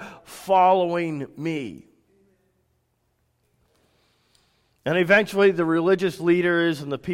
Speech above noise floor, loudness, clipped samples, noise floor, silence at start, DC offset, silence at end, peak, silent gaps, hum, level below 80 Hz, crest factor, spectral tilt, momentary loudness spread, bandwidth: 49 dB; -21 LUFS; under 0.1%; -70 dBFS; 0 s; under 0.1%; 0 s; -6 dBFS; none; none; -64 dBFS; 18 dB; -6 dB/octave; 14 LU; 16 kHz